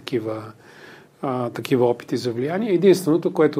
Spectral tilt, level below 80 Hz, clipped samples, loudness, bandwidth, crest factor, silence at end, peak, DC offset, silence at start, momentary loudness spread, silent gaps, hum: -6.5 dB/octave; -68 dBFS; under 0.1%; -21 LUFS; 16 kHz; 18 dB; 0 s; -4 dBFS; under 0.1%; 0.05 s; 14 LU; none; none